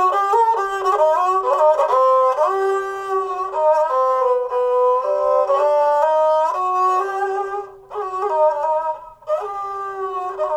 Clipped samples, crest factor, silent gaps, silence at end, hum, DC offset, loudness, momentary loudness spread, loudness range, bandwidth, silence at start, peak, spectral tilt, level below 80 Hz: under 0.1%; 12 dB; none; 0 s; 60 Hz at -70 dBFS; under 0.1%; -18 LUFS; 10 LU; 4 LU; 13 kHz; 0 s; -6 dBFS; -3.5 dB/octave; -60 dBFS